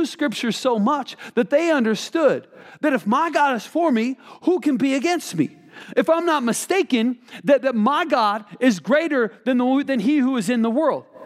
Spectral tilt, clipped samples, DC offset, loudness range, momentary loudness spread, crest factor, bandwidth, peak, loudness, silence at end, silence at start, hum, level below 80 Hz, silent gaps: -4.5 dB/octave; under 0.1%; under 0.1%; 2 LU; 6 LU; 16 dB; 15 kHz; -6 dBFS; -20 LUFS; 0 s; 0 s; none; -78 dBFS; none